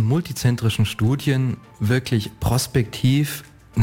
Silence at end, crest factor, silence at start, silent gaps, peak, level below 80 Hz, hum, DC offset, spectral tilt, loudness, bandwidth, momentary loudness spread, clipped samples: 0 s; 14 dB; 0 s; none; -8 dBFS; -42 dBFS; none; under 0.1%; -6 dB/octave; -21 LUFS; 17 kHz; 7 LU; under 0.1%